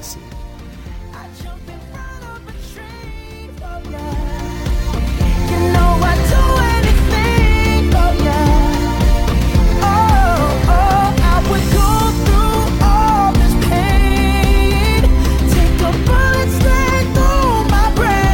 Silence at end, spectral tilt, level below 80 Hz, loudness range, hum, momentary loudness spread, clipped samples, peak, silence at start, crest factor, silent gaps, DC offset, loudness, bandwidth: 0 s; -6 dB/octave; -16 dBFS; 15 LU; none; 19 LU; under 0.1%; -2 dBFS; 0 s; 10 dB; none; under 0.1%; -14 LUFS; 17 kHz